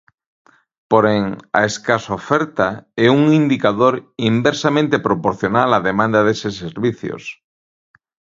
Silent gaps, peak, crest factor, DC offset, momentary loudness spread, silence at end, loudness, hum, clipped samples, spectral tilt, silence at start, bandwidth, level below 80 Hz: none; 0 dBFS; 18 dB; under 0.1%; 8 LU; 1.05 s; -17 LUFS; none; under 0.1%; -6 dB/octave; 0.9 s; 7.8 kHz; -52 dBFS